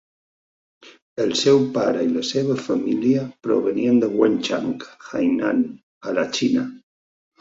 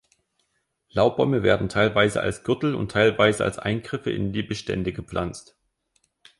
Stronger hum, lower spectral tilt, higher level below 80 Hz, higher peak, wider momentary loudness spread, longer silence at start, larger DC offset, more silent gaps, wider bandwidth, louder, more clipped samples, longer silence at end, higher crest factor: neither; about the same, -5 dB/octave vs -5.5 dB/octave; second, -64 dBFS vs -48 dBFS; about the same, -4 dBFS vs -4 dBFS; about the same, 11 LU vs 10 LU; about the same, 0.85 s vs 0.95 s; neither; first, 1.02-1.16 s, 5.83-6.01 s vs none; second, 7.8 kHz vs 11.5 kHz; about the same, -21 LUFS vs -23 LUFS; neither; second, 0.65 s vs 1 s; about the same, 18 dB vs 20 dB